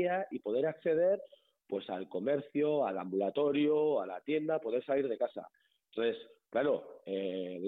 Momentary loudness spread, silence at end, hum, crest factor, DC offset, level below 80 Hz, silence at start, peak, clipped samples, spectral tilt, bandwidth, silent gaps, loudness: 9 LU; 0 s; none; 12 dB; under 0.1%; -82 dBFS; 0 s; -22 dBFS; under 0.1%; -9 dB/octave; 4.1 kHz; none; -34 LUFS